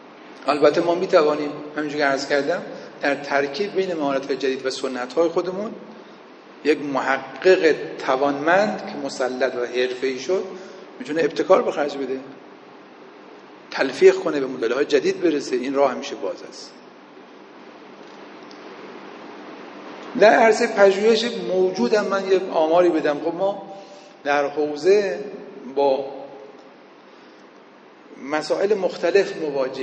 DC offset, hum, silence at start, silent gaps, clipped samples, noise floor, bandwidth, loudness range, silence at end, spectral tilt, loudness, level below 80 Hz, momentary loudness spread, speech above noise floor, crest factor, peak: under 0.1%; none; 0 s; none; under 0.1%; -47 dBFS; 8.8 kHz; 9 LU; 0 s; -4.5 dB/octave; -21 LUFS; -72 dBFS; 22 LU; 27 dB; 20 dB; -2 dBFS